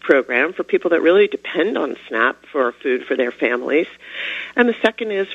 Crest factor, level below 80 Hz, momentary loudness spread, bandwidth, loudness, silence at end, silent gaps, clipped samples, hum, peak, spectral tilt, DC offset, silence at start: 18 dB; -66 dBFS; 9 LU; 7.8 kHz; -19 LUFS; 0 s; none; under 0.1%; none; 0 dBFS; -5.5 dB/octave; under 0.1%; 0.05 s